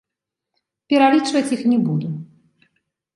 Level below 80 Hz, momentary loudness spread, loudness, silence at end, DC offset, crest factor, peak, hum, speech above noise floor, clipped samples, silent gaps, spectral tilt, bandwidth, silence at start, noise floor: -70 dBFS; 12 LU; -18 LUFS; 0.9 s; under 0.1%; 18 dB; -2 dBFS; none; 67 dB; under 0.1%; none; -6 dB/octave; 11.5 kHz; 0.9 s; -84 dBFS